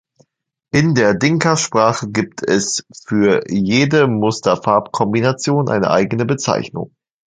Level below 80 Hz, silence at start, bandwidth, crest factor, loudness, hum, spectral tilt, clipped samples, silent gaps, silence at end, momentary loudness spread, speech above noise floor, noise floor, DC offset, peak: -52 dBFS; 0.75 s; 9.6 kHz; 16 dB; -16 LUFS; none; -5 dB/octave; under 0.1%; none; 0.45 s; 7 LU; 53 dB; -69 dBFS; under 0.1%; 0 dBFS